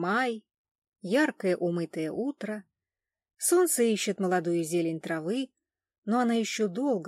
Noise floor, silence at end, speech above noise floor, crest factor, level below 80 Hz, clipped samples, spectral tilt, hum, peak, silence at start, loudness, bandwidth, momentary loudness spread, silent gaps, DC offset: under -90 dBFS; 0 s; over 62 dB; 16 dB; -84 dBFS; under 0.1%; -4.5 dB/octave; none; -14 dBFS; 0 s; -28 LUFS; 16 kHz; 13 LU; 0.58-0.65 s, 0.71-0.82 s, 0.88-0.92 s, 5.98-6.02 s; under 0.1%